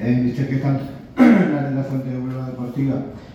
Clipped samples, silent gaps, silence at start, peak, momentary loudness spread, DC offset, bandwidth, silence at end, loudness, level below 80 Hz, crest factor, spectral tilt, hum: under 0.1%; none; 0 s; -2 dBFS; 13 LU; under 0.1%; 7.2 kHz; 0 s; -20 LUFS; -50 dBFS; 18 dB; -9 dB/octave; none